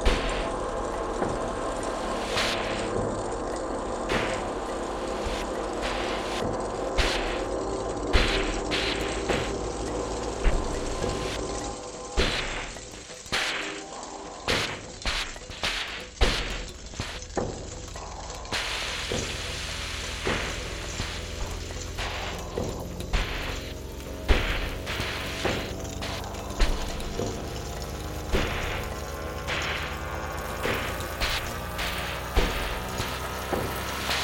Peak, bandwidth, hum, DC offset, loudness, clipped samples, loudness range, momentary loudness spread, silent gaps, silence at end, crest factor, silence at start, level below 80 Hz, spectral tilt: -4 dBFS; 17 kHz; none; under 0.1%; -30 LUFS; under 0.1%; 4 LU; 8 LU; none; 0 s; 24 dB; 0 s; -34 dBFS; -3.5 dB/octave